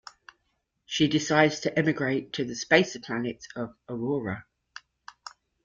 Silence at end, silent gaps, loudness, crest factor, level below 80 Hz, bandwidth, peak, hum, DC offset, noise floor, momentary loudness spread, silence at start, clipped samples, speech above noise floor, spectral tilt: 0.35 s; none; -27 LUFS; 24 dB; -64 dBFS; 7.6 kHz; -6 dBFS; none; under 0.1%; -76 dBFS; 24 LU; 0.9 s; under 0.1%; 50 dB; -4.5 dB/octave